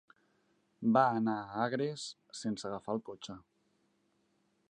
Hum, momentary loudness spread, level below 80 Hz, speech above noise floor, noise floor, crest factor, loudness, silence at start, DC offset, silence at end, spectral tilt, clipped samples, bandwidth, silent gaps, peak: none; 18 LU; -76 dBFS; 42 dB; -76 dBFS; 24 dB; -34 LUFS; 0.8 s; under 0.1%; 1.3 s; -5.5 dB/octave; under 0.1%; 9.8 kHz; none; -12 dBFS